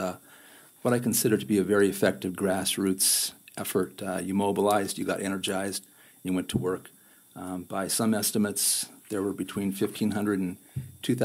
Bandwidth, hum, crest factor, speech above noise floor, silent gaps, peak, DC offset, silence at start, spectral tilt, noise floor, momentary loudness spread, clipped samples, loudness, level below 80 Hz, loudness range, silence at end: 16 kHz; none; 18 dB; 26 dB; none; -10 dBFS; under 0.1%; 0 s; -4 dB/octave; -53 dBFS; 11 LU; under 0.1%; -27 LUFS; -64 dBFS; 5 LU; 0 s